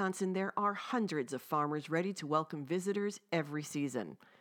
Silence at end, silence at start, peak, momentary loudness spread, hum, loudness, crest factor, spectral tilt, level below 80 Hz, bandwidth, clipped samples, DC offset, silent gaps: 0.25 s; 0 s; -16 dBFS; 4 LU; none; -36 LUFS; 20 dB; -5.5 dB/octave; under -90 dBFS; over 20 kHz; under 0.1%; under 0.1%; none